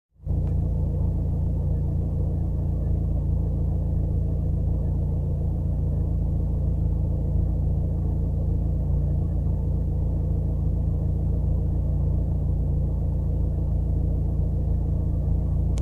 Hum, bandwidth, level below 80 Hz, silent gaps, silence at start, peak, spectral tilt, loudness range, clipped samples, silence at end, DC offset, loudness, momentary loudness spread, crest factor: none; 1.4 kHz; -26 dBFS; none; 0.2 s; -12 dBFS; -11.5 dB/octave; 0 LU; under 0.1%; 0 s; under 0.1%; -26 LUFS; 1 LU; 10 dB